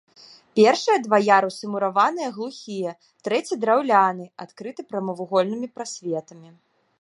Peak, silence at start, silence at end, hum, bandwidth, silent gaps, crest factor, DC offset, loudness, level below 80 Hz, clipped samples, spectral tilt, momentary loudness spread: -2 dBFS; 0.55 s; 0.55 s; none; 11.5 kHz; none; 20 dB; under 0.1%; -22 LUFS; -78 dBFS; under 0.1%; -4.5 dB/octave; 16 LU